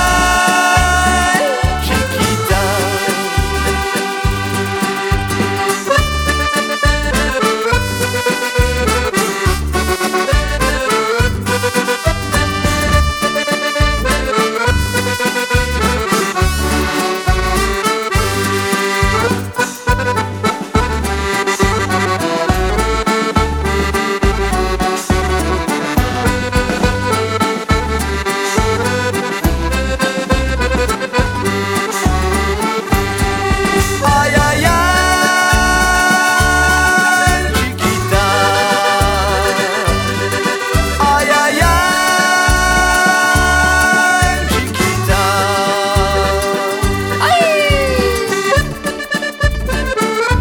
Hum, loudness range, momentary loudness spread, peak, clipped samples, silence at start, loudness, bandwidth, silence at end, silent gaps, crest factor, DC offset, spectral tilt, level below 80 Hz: none; 4 LU; 6 LU; 0 dBFS; under 0.1%; 0 s; -14 LUFS; 19 kHz; 0 s; none; 14 dB; under 0.1%; -4 dB/octave; -22 dBFS